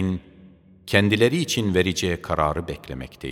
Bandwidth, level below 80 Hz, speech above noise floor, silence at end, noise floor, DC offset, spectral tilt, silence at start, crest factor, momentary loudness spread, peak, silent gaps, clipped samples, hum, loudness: 17 kHz; -44 dBFS; 27 dB; 0 s; -50 dBFS; under 0.1%; -5 dB/octave; 0 s; 22 dB; 15 LU; -2 dBFS; none; under 0.1%; none; -22 LUFS